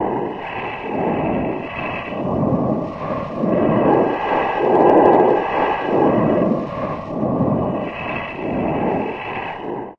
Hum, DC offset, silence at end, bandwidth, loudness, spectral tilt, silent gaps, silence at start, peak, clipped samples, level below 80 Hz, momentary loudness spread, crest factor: none; under 0.1%; 0.05 s; 6.6 kHz; -19 LUFS; -9 dB/octave; none; 0 s; 0 dBFS; under 0.1%; -44 dBFS; 11 LU; 18 dB